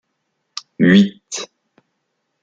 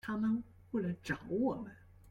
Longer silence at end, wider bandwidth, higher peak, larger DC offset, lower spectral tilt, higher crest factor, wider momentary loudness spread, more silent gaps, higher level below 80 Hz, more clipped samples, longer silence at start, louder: first, 1 s vs 0 s; second, 8.6 kHz vs 12 kHz; first, -2 dBFS vs -22 dBFS; neither; second, -5.5 dB/octave vs -7.5 dB/octave; about the same, 18 dB vs 16 dB; first, 21 LU vs 8 LU; neither; about the same, -60 dBFS vs -64 dBFS; neither; first, 0.8 s vs 0.05 s; first, -14 LUFS vs -37 LUFS